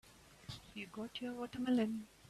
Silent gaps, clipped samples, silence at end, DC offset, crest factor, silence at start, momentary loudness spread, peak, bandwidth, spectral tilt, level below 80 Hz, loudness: none; under 0.1%; 0 s; under 0.1%; 16 dB; 0.05 s; 17 LU; -26 dBFS; 13.5 kHz; -5.5 dB/octave; -70 dBFS; -41 LUFS